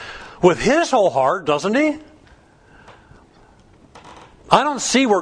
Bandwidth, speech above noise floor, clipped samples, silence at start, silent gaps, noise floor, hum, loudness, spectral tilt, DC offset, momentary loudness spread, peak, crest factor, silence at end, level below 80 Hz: 10.5 kHz; 33 dB; under 0.1%; 0 s; none; -50 dBFS; none; -17 LUFS; -4 dB/octave; under 0.1%; 5 LU; 0 dBFS; 20 dB; 0 s; -48 dBFS